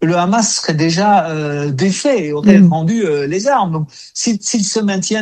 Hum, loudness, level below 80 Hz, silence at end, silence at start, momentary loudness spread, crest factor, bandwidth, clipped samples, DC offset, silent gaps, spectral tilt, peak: none; -14 LUFS; -54 dBFS; 0 s; 0 s; 9 LU; 14 dB; 10 kHz; 0.1%; under 0.1%; none; -5 dB/octave; 0 dBFS